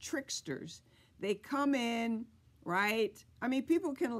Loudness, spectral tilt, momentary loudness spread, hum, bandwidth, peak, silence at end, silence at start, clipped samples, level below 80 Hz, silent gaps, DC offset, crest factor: -35 LUFS; -4 dB/octave; 14 LU; none; 15 kHz; -20 dBFS; 0 s; 0 s; under 0.1%; -72 dBFS; none; under 0.1%; 16 dB